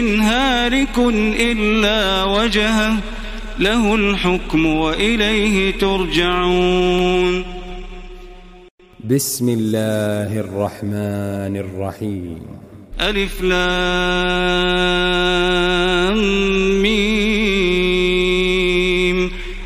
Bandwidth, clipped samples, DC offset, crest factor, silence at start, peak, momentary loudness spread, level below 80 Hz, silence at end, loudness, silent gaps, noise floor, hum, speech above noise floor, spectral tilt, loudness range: 16 kHz; under 0.1%; under 0.1%; 16 dB; 0 s; -2 dBFS; 10 LU; -28 dBFS; 0 s; -17 LUFS; 8.71-8.78 s; -38 dBFS; none; 21 dB; -4.5 dB/octave; 6 LU